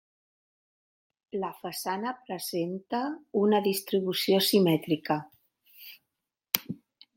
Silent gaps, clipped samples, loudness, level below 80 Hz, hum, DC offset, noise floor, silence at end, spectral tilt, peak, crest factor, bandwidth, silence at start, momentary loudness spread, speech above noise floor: none; under 0.1%; -28 LUFS; -76 dBFS; none; under 0.1%; -86 dBFS; 0.4 s; -4.5 dB/octave; 0 dBFS; 30 dB; 17 kHz; 1.35 s; 19 LU; 58 dB